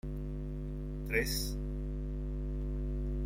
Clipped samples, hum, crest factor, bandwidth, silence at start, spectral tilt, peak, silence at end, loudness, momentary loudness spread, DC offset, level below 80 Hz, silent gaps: under 0.1%; 50 Hz at -40 dBFS; 20 dB; 16 kHz; 0.05 s; -5 dB/octave; -16 dBFS; 0 s; -38 LUFS; 8 LU; under 0.1%; -38 dBFS; none